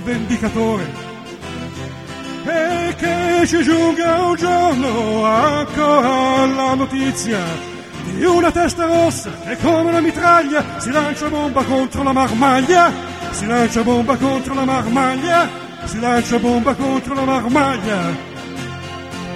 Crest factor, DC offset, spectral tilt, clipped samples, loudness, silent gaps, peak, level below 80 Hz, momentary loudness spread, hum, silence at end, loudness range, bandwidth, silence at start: 16 dB; 0.1%; -5 dB/octave; under 0.1%; -16 LUFS; none; 0 dBFS; -42 dBFS; 14 LU; none; 0 s; 3 LU; 14.5 kHz; 0 s